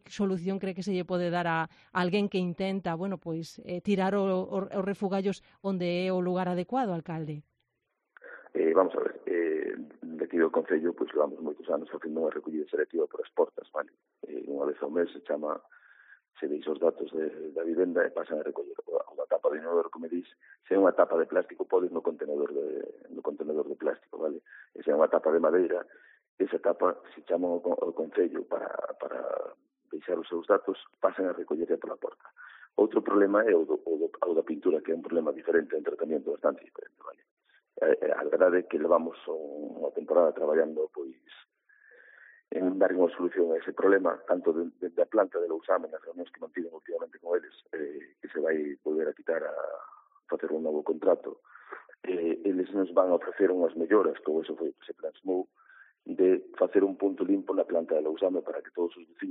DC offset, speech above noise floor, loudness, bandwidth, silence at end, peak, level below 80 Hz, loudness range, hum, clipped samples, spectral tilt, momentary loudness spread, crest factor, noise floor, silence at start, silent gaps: under 0.1%; 52 dB; -30 LUFS; 7.6 kHz; 0 s; -8 dBFS; -78 dBFS; 5 LU; none; under 0.1%; -5.5 dB/octave; 14 LU; 20 dB; -81 dBFS; 0.1 s; 26.29-26.38 s, 37.31-37.37 s